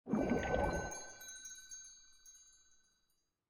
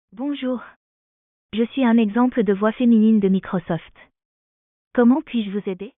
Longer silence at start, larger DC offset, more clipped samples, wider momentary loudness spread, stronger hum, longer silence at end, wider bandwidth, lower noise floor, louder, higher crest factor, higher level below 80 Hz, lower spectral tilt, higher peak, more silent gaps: second, 0.05 s vs 0.2 s; neither; neither; first, 23 LU vs 12 LU; neither; first, 1 s vs 0.1 s; first, 17 kHz vs 3.9 kHz; second, -81 dBFS vs under -90 dBFS; second, -40 LUFS vs -20 LUFS; first, 22 dB vs 16 dB; about the same, -54 dBFS vs -58 dBFS; second, -5 dB/octave vs -6.5 dB/octave; second, -20 dBFS vs -6 dBFS; second, none vs 0.76-1.49 s, 4.25-4.91 s